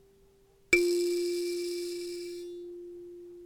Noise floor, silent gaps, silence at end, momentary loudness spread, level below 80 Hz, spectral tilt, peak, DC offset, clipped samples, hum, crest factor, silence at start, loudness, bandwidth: -62 dBFS; none; 0 s; 20 LU; -62 dBFS; -2.5 dB/octave; -10 dBFS; under 0.1%; under 0.1%; none; 24 dB; 0.7 s; -30 LUFS; 17.5 kHz